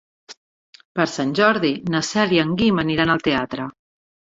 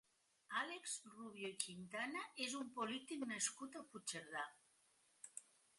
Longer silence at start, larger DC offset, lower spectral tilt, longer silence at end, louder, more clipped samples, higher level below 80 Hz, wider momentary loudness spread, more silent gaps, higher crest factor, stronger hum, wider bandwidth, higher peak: second, 0.3 s vs 0.5 s; neither; first, -5 dB/octave vs -1.5 dB/octave; first, 0.6 s vs 0.35 s; first, -20 LUFS vs -47 LUFS; neither; first, -52 dBFS vs under -90 dBFS; about the same, 11 LU vs 13 LU; first, 0.37-0.73 s, 0.85-0.95 s vs none; second, 20 dB vs 28 dB; neither; second, 8 kHz vs 11.5 kHz; first, -2 dBFS vs -22 dBFS